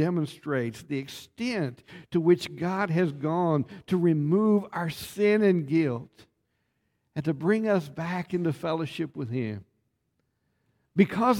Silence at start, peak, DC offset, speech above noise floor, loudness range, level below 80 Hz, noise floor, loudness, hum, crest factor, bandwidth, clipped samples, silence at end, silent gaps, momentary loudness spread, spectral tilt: 0 s; -8 dBFS; under 0.1%; 50 dB; 5 LU; -66 dBFS; -76 dBFS; -27 LUFS; none; 20 dB; 17 kHz; under 0.1%; 0 s; none; 11 LU; -7.5 dB/octave